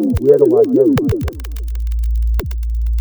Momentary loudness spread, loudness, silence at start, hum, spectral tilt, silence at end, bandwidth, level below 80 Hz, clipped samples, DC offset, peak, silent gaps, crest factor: 13 LU; -15 LUFS; 0 s; none; -8.5 dB/octave; 0 s; over 20 kHz; -20 dBFS; under 0.1%; under 0.1%; 0 dBFS; none; 14 dB